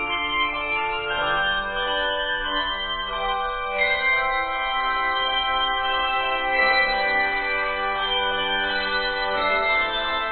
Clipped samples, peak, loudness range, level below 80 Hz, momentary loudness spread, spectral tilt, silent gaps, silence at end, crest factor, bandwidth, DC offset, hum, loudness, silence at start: under 0.1%; -8 dBFS; 2 LU; -44 dBFS; 4 LU; -6 dB/octave; none; 0 s; 16 dB; 4.7 kHz; under 0.1%; none; -22 LUFS; 0 s